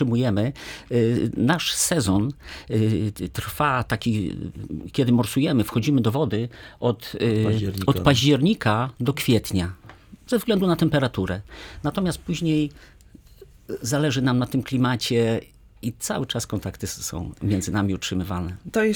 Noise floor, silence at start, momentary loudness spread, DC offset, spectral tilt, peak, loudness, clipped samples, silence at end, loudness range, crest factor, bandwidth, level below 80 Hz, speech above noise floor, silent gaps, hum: -49 dBFS; 0 s; 10 LU; under 0.1%; -5.5 dB/octave; -4 dBFS; -23 LUFS; under 0.1%; 0 s; 4 LU; 18 dB; over 20 kHz; -46 dBFS; 26 dB; none; none